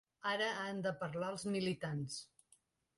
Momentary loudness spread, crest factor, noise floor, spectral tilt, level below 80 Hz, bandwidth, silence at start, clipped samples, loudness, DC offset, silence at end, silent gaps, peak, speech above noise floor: 8 LU; 16 dB; -74 dBFS; -4.5 dB/octave; -76 dBFS; 11.5 kHz; 0.25 s; under 0.1%; -40 LUFS; under 0.1%; 0.75 s; none; -26 dBFS; 34 dB